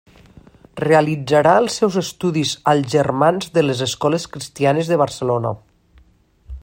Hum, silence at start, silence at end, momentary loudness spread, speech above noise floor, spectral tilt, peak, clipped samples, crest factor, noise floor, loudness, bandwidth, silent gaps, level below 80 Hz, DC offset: none; 0.75 s; 0.05 s; 8 LU; 36 dB; -5.5 dB/octave; 0 dBFS; under 0.1%; 18 dB; -53 dBFS; -18 LUFS; 16.5 kHz; none; -48 dBFS; under 0.1%